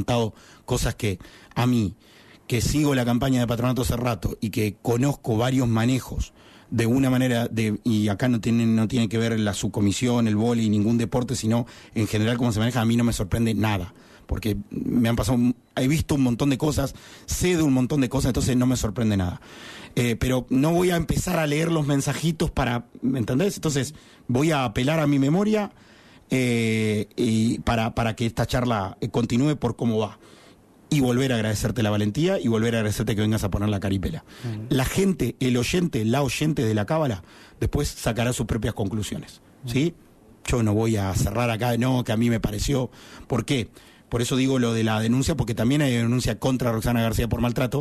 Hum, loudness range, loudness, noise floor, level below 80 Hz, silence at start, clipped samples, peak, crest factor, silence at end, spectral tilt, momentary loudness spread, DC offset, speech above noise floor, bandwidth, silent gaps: none; 2 LU; -24 LUFS; -52 dBFS; -40 dBFS; 0 s; under 0.1%; -12 dBFS; 12 dB; 0 s; -6 dB/octave; 7 LU; under 0.1%; 29 dB; 13.5 kHz; none